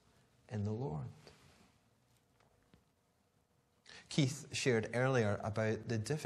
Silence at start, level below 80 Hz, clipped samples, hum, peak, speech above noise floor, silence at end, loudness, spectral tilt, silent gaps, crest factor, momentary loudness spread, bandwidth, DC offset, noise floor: 0.5 s; -70 dBFS; under 0.1%; none; -18 dBFS; 40 dB; 0 s; -37 LUFS; -5.5 dB/octave; none; 22 dB; 13 LU; 13 kHz; under 0.1%; -76 dBFS